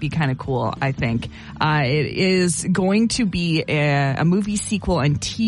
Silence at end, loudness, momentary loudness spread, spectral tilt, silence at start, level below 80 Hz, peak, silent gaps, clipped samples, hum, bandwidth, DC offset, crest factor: 0 s; -20 LUFS; 5 LU; -5.5 dB/octave; 0 s; -40 dBFS; -4 dBFS; none; under 0.1%; none; 11.5 kHz; under 0.1%; 14 dB